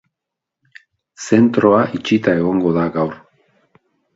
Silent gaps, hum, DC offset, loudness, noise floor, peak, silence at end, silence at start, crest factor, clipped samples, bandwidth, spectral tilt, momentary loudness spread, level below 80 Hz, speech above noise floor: none; none; under 0.1%; -16 LUFS; -82 dBFS; 0 dBFS; 1 s; 1.2 s; 18 dB; under 0.1%; 8 kHz; -6.5 dB/octave; 9 LU; -52 dBFS; 68 dB